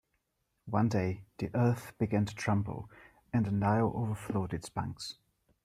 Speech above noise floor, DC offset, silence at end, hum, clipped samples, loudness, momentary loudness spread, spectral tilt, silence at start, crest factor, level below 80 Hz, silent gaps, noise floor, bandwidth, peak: 49 dB; under 0.1%; 0.5 s; none; under 0.1%; -33 LUFS; 12 LU; -7 dB/octave; 0.65 s; 18 dB; -60 dBFS; none; -80 dBFS; 13.5 kHz; -16 dBFS